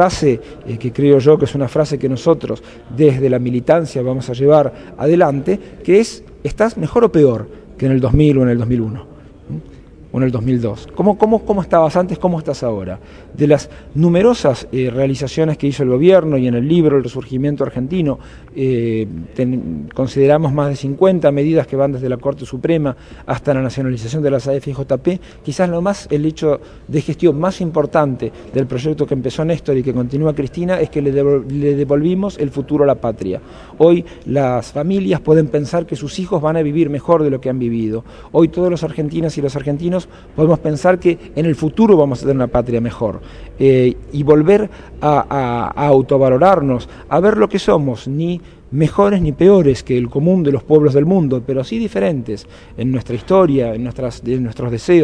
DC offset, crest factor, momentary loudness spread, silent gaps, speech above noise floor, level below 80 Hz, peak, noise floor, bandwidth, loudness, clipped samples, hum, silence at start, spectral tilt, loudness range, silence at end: under 0.1%; 14 dB; 11 LU; none; 24 dB; -38 dBFS; 0 dBFS; -38 dBFS; 10.5 kHz; -15 LUFS; under 0.1%; none; 0 s; -8 dB/octave; 4 LU; 0 s